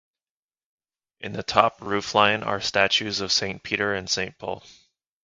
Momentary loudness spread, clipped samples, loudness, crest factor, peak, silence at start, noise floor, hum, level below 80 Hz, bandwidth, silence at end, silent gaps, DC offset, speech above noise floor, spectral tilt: 14 LU; under 0.1%; -23 LUFS; 26 dB; 0 dBFS; 1.2 s; under -90 dBFS; none; -56 dBFS; 11 kHz; 0.5 s; none; under 0.1%; over 66 dB; -2.5 dB/octave